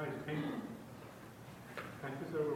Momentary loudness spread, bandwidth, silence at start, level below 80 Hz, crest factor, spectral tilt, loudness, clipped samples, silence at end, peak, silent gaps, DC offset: 13 LU; 17 kHz; 0 s; -72 dBFS; 18 dB; -6.5 dB/octave; -45 LUFS; under 0.1%; 0 s; -26 dBFS; none; under 0.1%